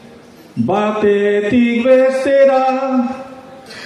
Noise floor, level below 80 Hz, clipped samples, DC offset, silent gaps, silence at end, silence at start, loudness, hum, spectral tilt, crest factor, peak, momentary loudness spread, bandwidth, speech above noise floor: -40 dBFS; -56 dBFS; under 0.1%; under 0.1%; none; 0 s; 0.55 s; -14 LUFS; none; -6.5 dB/octave; 14 dB; 0 dBFS; 17 LU; 10.5 kHz; 27 dB